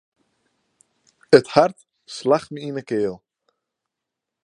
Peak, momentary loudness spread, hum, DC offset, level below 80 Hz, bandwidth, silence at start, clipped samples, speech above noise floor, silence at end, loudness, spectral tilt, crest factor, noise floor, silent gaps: 0 dBFS; 15 LU; none; under 0.1%; -66 dBFS; 11 kHz; 1.3 s; under 0.1%; 65 dB; 1.3 s; -20 LUFS; -5.5 dB/octave; 22 dB; -84 dBFS; none